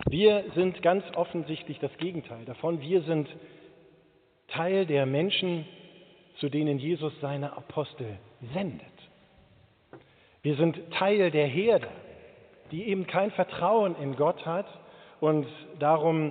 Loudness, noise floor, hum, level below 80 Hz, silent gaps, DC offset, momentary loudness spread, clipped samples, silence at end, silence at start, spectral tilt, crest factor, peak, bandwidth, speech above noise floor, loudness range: -28 LUFS; -63 dBFS; none; -60 dBFS; none; under 0.1%; 15 LU; under 0.1%; 0 s; 0 s; -5 dB/octave; 22 dB; -8 dBFS; 4.6 kHz; 36 dB; 6 LU